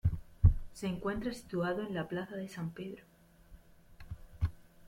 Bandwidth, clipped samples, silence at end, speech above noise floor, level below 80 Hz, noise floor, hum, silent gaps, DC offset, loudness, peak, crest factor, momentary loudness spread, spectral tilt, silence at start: 14 kHz; under 0.1%; 0 s; 20 dB; -42 dBFS; -58 dBFS; none; none; under 0.1%; -36 LUFS; -12 dBFS; 24 dB; 18 LU; -7.5 dB/octave; 0.05 s